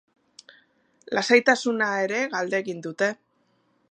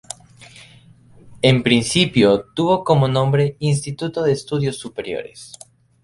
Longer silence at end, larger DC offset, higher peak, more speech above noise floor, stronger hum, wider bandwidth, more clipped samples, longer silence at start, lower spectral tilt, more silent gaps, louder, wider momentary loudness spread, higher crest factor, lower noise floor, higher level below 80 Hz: first, 0.75 s vs 0.55 s; neither; about the same, -2 dBFS vs 0 dBFS; first, 44 dB vs 30 dB; neither; about the same, 10.5 kHz vs 11.5 kHz; neither; first, 1.1 s vs 0.4 s; second, -3.5 dB/octave vs -5.5 dB/octave; neither; second, -23 LUFS vs -18 LUFS; second, 11 LU vs 18 LU; first, 24 dB vs 18 dB; first, -68 dBFS vs -48 dBFS; second, -80 dBFS vs -50 dBFS